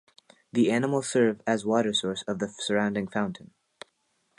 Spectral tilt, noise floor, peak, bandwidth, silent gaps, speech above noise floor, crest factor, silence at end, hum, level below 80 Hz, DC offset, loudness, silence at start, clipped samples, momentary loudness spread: -4.5 dB/octave; -73 dBFS; -10 dBFS; 11 kHz; none; 46 dB; 18 dB; 1.05 s; none; -68 dBFS; under 0.1%; -27 LUFS; 0.55 s; under 0.1%; 8 LU